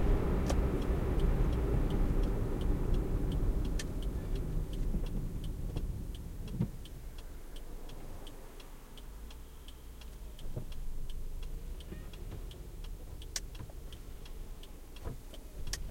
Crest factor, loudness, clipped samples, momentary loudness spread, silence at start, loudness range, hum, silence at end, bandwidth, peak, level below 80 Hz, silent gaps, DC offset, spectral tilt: 18 dB; -38 LUFS; under 0.1%; 17 LU; 0 s; 15 LU; none; 0 s; 16.5 kHz; -18 dBFS; -36 dBFS; none; under 0.1%; -6 dB/octave